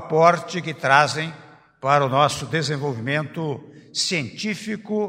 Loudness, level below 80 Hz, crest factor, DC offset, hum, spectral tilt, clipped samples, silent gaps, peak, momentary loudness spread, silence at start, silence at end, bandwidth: -22 LUFS; -62 dBFS; 22 dB; under 0.1%; none; -4.5 dB/octave; under 0.1%; none; 0 dBFS; 12 LU; 0 s; 0 s; 16 kHz